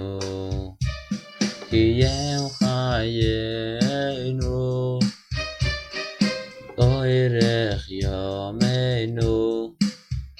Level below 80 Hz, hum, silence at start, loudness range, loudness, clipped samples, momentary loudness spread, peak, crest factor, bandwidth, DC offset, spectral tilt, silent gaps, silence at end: -36 dBFS; none; 0 s; 2 LU; -24 LUFS; under 0.1%; 9 LU; -6 dBFS; 18 dB; 11.5 kHz; under 0.1%; -6 dB/octave; none; 0.05 s